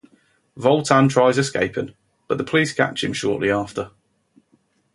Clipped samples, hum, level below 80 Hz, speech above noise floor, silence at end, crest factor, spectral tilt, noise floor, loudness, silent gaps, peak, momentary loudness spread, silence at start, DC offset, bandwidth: under 0.1%; none; -56 dBFS; 44 dB; 1.05 s; 20 dB; -5 dB/octave; -63 dBFS; -20 LUFS; none; 0 dBFS; 14 LU; 0.55 s; under 0.1%; 11.5 kHz